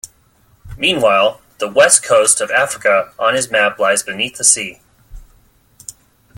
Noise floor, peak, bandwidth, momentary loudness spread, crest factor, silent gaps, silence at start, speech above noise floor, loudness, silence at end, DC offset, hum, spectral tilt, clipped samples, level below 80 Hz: -53 dBFS; 0 dBFS; 17 kHz; 16 LU; 16 dB; none; 0.05 s; 39 dB; -13 LUFS; 0.45 s; under 0.1%; none; -1 dB/octave; under 0.1%; -46 dBFS